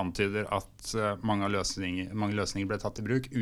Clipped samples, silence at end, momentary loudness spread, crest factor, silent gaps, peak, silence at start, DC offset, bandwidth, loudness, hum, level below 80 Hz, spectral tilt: under 0.1%; 0 s; 5 LU; 18 dB; none; -14 dBFS; 0 s; under 0.1%; 15 kHz; -32 LUFS; none; -52 dBFS; -5 dB/octave